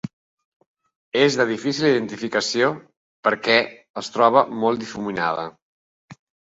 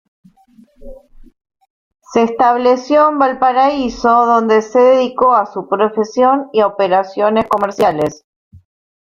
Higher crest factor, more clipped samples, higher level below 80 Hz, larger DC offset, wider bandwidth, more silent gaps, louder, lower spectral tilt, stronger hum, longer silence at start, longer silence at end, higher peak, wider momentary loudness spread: first, 22 dB vs 14 dB; neither; second, -64 dBFS vs -48 dBFS; neither; second, 8 kHz vs 14.5 kHz; first, 0.13-0.37 s, 0.45-0.60 s, 0.67-0.75 s, 0.96-1.12 s, 2.97-3.23 s, 3.90-3.94 s, 5.62-6.08 s vs 1.70-1.91 s; second, -21 LUFS vs -13 LUFS; second, -4 dB/octave vs -5.5 dB/octave; neither; second, 0.05 s vs 0.8 s; second, 0.35 s vs 1 s; about the same, 0 dBFS vs 0 dBFS; first, 13 LU vs 5 LU